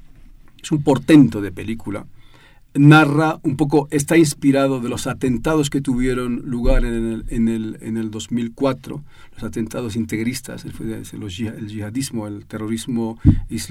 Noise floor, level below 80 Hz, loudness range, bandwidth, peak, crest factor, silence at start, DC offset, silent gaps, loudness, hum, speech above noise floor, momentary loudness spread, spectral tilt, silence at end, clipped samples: -46 dBFS; -30 dBFS; 10 LU; 16 kHz; 0 dBFS; 18 dB; 0.6 s; under 0.1%; none; -19 LUFS; none; 28 dB; 17 LU; -6.5 dB/octave; 0 s; under 0.1%